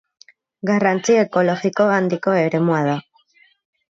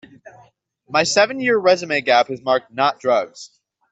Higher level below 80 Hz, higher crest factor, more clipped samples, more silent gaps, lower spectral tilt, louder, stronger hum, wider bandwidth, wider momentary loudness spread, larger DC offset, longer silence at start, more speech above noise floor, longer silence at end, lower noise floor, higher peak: about the same, -68 dBFS vs -66 dBFS; about the same, 16 dB vs 16 dB; neither; neither; first, -6 dB/octave vs -3 dB/octave; about the same, -18 LUFS vs -18 LUFS; neither; about the same, 7.8 kHz vs 8.2 kHz; about the same, 6 LU vs 5 LU; neither; first, 0.65 s vs 0.25 s; about the same, 39 dB vs 36 dB; first, 0.95 s vs 0.45 s; about the same, -56 dBFS vs -54 dBFS; about the same, -4 dBFS vs -2 dBFS